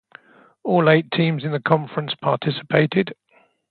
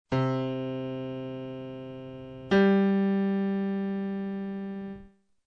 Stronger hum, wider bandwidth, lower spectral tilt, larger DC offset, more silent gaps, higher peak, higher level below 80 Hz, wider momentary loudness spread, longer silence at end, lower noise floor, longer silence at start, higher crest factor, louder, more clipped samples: neither; second, 4.6 kHz vs 6 kHz; about the same, -10 dB/octave vs -9 dB/octave; neither; neither; first, 0 dBFS vs -12 dBFS; about the same, -64 dBFS vs -62 dBFS; second, 8 LU vs 18 LU; first, 0.55 s vs 0.4 s; about the same, -49 dBFS vs -52 dBFS; first, 0.65 s vs 0.1 s; about the same, 20 dB vs 16 dB; first, -20 LUFS vs -29 LUFS; neither